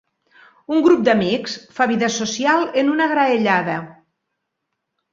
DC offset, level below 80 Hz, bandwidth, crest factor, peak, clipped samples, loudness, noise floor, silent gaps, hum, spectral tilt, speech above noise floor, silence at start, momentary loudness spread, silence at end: under 0.1%; -62 dBFS; 7.6 kHz; 18 dB; -2 dBFS; under 0.1%; -18 LUFS; -77 dBFS; none; none; -4.5 dB/octave; 60 dB; 0.7 s; 8 LU; 1.2 s